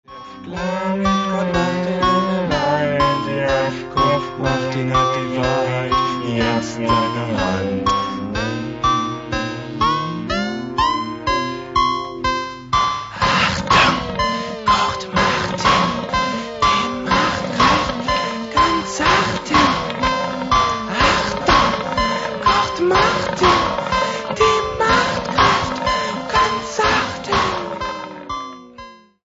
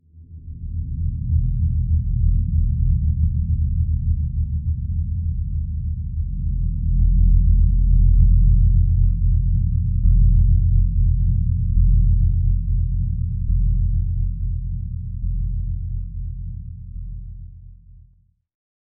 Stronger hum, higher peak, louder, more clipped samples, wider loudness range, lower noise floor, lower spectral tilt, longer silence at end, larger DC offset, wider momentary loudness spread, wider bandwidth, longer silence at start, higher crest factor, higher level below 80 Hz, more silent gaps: neither; first, 0 dBFS vs -4 dBFS; first, -18 LUFS vs -21 LUFS; neither; second, 4 LU vs 10 LU; second, -40 dBFS vs -57 dBFS; second, -4.5 dB/octave vs -23.5 dB/octave; second, 0.3 s vs 1.1 s; neither; second, 7 LU vs 14 LU; first, 8 kHz vs 0.3 kHz; about the same, 0.1 s vs 0.15 s; about the same, 18 dB vs 14 dB; second, -36 dBFS vs -20 dBFS; neither